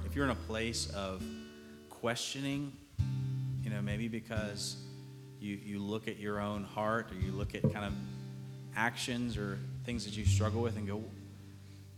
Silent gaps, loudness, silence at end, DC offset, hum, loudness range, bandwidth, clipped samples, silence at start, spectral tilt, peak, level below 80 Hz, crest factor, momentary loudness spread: none; -37 LUFS; 0 s; under 0.1%; none; 3 LU; 15.5 kHz; under 0.1%; 0 s; -5 dB/octave; -16 dBFS; -52 dBFS; 20 dB; 14 LU